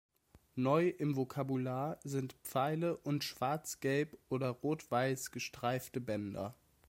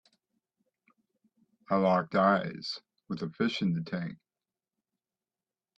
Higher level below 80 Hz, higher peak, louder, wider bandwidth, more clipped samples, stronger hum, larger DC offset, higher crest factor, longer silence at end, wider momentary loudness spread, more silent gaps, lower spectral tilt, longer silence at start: about the same, -72 dBFS vs -72 dBFS; second, -18 dBFS vs -12 dBFS; second, -37 LUFS vs -30 LUFS; first, 16.5 kHz vs 7.8 kHz; neither; neither; neither; about the same, 18 dB vs 22 dB; second, 0.35 s vs 1.6 s; second, 7 LU vs 14 LU; neither; second, -5.5 dB/octave vs -7 dB/octave; second, 0.55 s vs 1.7 s